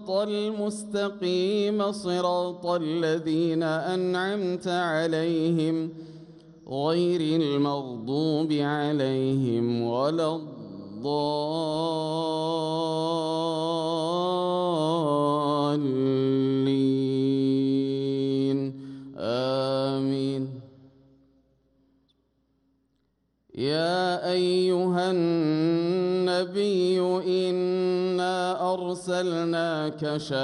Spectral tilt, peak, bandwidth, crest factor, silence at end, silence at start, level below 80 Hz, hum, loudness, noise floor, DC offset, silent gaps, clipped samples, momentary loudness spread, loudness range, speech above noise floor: -6.5 dB/octave; -12 dBFS; 11.5 kHz; 14 dB; 0 s; 0 s; -70 dBFS; none; -26 LUFS; -72 dBFS; under 0.1%; none; under 0.1%; 6 LU; 6 LU; 47 dB